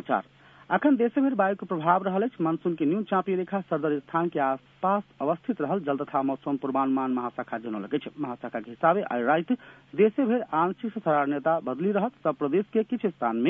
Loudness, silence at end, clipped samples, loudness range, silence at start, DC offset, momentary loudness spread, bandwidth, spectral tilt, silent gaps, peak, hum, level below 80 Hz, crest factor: -27 LUFS; 0 s; under 0.1%; 3 LU; 0.05 s; under 0.1%; 7 LU; 3.8 kHz; -10 dB/octave; none; -6 dBFS; none; -72 dBFS; 20 dB